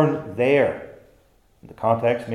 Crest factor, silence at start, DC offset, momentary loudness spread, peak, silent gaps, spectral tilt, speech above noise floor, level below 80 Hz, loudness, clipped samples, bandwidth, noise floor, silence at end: 18 dB; 0 s; under 0.1%; 14 LU; -6 dBFS; none; -8 dB/octave; 37 dB; -60 dBFS; -21 LUFS; under 0.1%; 12 kHz; -58 dBFS; 0 s